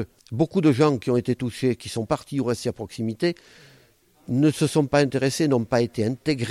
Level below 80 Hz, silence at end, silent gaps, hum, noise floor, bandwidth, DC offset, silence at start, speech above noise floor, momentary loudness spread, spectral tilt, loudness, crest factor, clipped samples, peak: -56 dBFS; 0 s; none; none; -58 dBFS; 15 kHz; under 0.1%; 0 s; 36 dB; 8 LU; -6 dB/octave; -23 LUFS; 18 dB; under 0.1%; -6 dBFS